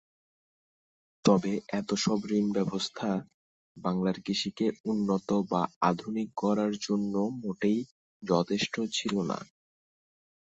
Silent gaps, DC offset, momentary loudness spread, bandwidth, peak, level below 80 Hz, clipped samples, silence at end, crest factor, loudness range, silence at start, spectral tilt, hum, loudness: 3.34-3.75 s, 4.80-4.84 s, 5.76-5.81 s, 7.91-8.20 s; under 0.1%; 6 LU; 8.2 kHz; -10 dBFS; -68 dBFS; under 0.1%; 1 s; 22 dB; 1 LU; 1.25 s; -5.5 dB/octave; none; -30 LUFS